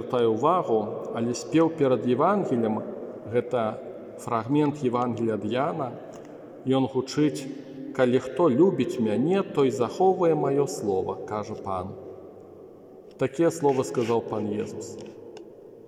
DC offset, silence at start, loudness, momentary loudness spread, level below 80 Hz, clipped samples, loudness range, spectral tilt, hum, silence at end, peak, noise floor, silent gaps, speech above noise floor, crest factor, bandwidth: under 0.1%; 0 s; -25 LUFS; 17 LU; -70 dBFS; under 0.1%; 5 LU; -6.5 dB/octave; none; 0.05 s; -8 dBFS; -47 dBFS; none; 22 dB; 18 dB; 13.5 kHz